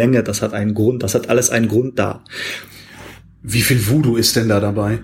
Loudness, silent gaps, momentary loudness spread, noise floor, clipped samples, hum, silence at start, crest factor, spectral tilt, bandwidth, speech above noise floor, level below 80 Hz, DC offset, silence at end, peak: -17 LUFS; none; 18 LU; -39 dBFS; under 0.1%; none; 0 s; 16 dB; -4.5 dB/octave; 16.5 kHz; 22 dB; -44 dBFS; under 0.1%; 0 s; -2 dBFS